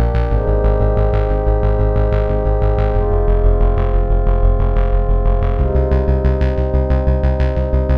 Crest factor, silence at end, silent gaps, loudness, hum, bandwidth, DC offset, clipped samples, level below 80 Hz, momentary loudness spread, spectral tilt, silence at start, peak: 12 dB; 0 s; none; -17 LUFS; none; 4.3 kHz; 0.4%; under 0.1%; -14 dBFS; 2 LU; -10.5 dB/octave; 0 s; -2 dBFS